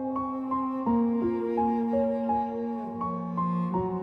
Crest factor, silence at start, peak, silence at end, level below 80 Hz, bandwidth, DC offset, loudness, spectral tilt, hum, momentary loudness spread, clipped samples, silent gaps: 12 dB; 0 s; -16 dBFS; 0 s; -56 dBFS; 4.2 kHz; under 0.1%; -28 LUFS; -10.5 dB/octave; none; 6 LU; under 0.1%; none